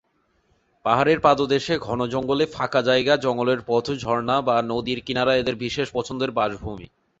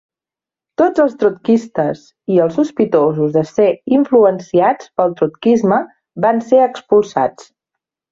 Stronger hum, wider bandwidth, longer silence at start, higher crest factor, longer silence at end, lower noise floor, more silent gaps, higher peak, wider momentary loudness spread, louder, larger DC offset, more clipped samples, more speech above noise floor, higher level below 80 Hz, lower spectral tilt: neither; about the same, 8 kHz vs 7.6 kHz; about the same, 0.85 s vs 0.8 s; first, 20 dB vs 14 dB; second, 0.35 s vs 0.8 s; second, -66 dBFS vs -89 dBFS; neither; about the same, -4 dBFS vs -2 dBFS; about the same, 8 LU vs 6 LU; second, -22 LUFS vs -15 LUFS; neither; neither; second, 45 dB vs 75 dB; first, -52 dBFS vs -58 dBFS; second, -5.5 dB/octave vs -7.5 dB/octave